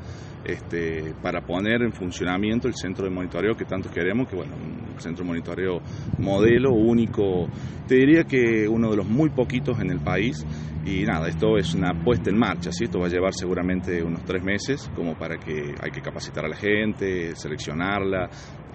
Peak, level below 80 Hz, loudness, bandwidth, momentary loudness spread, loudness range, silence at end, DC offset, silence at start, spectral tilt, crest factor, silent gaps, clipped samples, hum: -6 dBFS; -44 dBFS; -24 LUFS; 8.4 kHz; 12 LU; 7 LU; 0 s; under 0.1%; 0 s; -6.5 dB/octave; 18 dB; none; under 0.1%; none